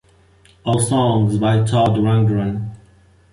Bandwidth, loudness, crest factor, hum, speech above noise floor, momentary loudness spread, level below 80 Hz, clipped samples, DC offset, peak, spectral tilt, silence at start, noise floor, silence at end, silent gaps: 11 kHz; -17 LUFS; 12 dB; none; 35 dB; 11 LU; -44 dBFS; under 0.1%; under 0.1%; -6 dBFS; -6.5 dB/octave; 0.65 s; -51 dBFS; 0.55 s; none